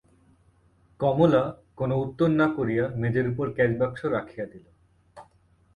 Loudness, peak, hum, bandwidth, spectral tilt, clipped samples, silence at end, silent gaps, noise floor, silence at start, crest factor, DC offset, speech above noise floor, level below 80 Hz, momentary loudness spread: -25 LUFS; -6 dBFS; none; 8.6 kHz; -9 dB/octave; under 0.1%; 0.55 s; none; -61 dBFS; 1 s; 20 dB; under 0.1%; 37 dB; -54 dBFS; 11 LU